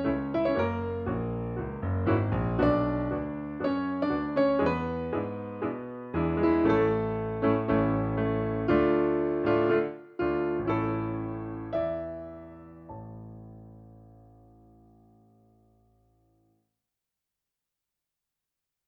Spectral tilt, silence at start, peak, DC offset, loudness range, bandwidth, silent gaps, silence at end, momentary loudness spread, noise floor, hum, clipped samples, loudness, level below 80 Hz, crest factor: -10 dB/octave; 0 s; -12 dBFS; under 0.1%; 12 LU; 5.4 kHz; none; 4.75 s; 17 LU; -87 dBFS; none; under 0.1%; -28 LUFS; -48 dBFS; 18 dB